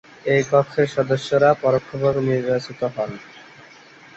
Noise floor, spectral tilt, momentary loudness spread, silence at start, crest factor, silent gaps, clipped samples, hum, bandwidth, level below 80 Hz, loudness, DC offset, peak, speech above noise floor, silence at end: -46 dBFS; -6.5 dB/octave; 10 LU; 0.25 s; 18 dB; none; under 0.1%; none; 8.2 kHz; -58 dBFS; -20 LUFS; under 0.1%; -4 dBFS; 27 dB; 0.75 s